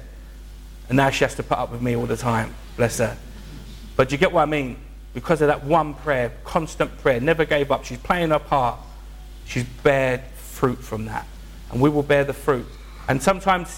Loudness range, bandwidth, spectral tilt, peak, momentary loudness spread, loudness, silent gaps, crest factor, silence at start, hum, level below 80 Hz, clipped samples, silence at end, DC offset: 2 LU; 17 kHz; -5.5 dB/octave; -6 dBFS; 21 LU; -22 LUFS; none; 16 dB; 0 s; none; -38 dBFS; under 0.1%; 0 s; under 0.1%